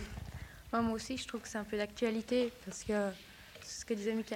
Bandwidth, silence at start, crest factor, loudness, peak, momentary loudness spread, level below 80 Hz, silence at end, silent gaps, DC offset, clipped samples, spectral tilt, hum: 16.5 kHz; 0 s; 18 dB; -37 LUFS; -20 dBFS; 14 LU; -56 dBFS; 0 s; none; under 0.1%; under 0.1%; -4.5 dB/octave; none